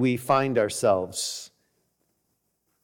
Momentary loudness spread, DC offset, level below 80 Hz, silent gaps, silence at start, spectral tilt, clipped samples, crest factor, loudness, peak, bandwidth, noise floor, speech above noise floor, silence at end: 9 LU; under 0.1%; -66 dBFS; none; 0 s; -4.5 dB/octave; under 0.1%; 16 dB; -24 LUFS; -10 dBFS; 19 kHz; -75 dBFS; 51 dB; 1.35 s